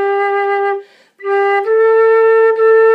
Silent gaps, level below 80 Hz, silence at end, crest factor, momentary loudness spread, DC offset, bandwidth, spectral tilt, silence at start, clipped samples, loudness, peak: none; -84 dBFS; 0 s; 10 dB; 9 LU; under 0.1%; 5 kHz; -3 dB/octave; 0 s; under 0.1%; -12 LUFS; -2 dBFS